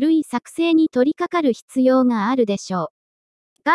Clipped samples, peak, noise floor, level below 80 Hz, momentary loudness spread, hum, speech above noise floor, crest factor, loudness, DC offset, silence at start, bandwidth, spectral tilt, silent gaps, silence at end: under 0.1%; -4 dBFS; under -90 dBFS; -68 dBFS; 10 LU; none; over 72 dB; 16 dB; -19 LUFS; under 0.1%; 0 s; 12 kHz; -5.5 dB/octave; 1.62-1.68 s, 2.90-3.56 s; 0 s